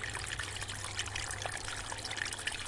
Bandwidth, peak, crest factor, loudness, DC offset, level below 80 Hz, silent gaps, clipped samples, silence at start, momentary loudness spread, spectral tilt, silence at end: 11.5 kHz; -18 dBFS; 20 dB; -38 LUFS; under 0.1%; -52 dBFS; none; under 0.1%; 0 s; 3 LU; -1.5 dB/octave; 0 s